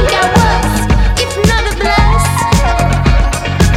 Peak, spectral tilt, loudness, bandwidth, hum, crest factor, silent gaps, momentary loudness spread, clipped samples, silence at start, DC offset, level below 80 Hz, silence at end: 0 dBFS; -5 dB/octave; -11 LUFS; 15.5 kHz; none; 10 dB; none; 3 LU; under 0.1%; 0 s; under 0.1%; -14 dBFS; 0 s